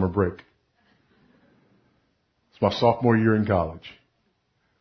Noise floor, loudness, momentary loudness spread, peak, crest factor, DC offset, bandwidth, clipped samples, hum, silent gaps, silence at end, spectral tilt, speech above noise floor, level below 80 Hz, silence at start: -71 dBFS; -23 LUFS; 15 LU; -4 dBFS; 22 dB; under 0.1%; 6.4 kHz; under 0.1%; none; none; 0.9 s; -8 dB/octave; 48 dB; -46 dBFS; 0 s